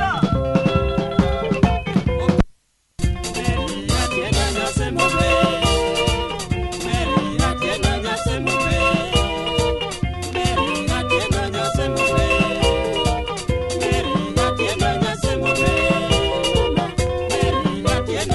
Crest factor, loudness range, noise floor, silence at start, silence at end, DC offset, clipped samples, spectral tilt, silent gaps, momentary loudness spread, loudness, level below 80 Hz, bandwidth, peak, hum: 20 dB; 2 LU; -55 dBFS; 0 s; 0 s; under 0.1%; under 0.1%; -5 dB/octave; none; 6 LU; -20 LUFS; -28 dBFS; 12 kHz; 0 dBFS; none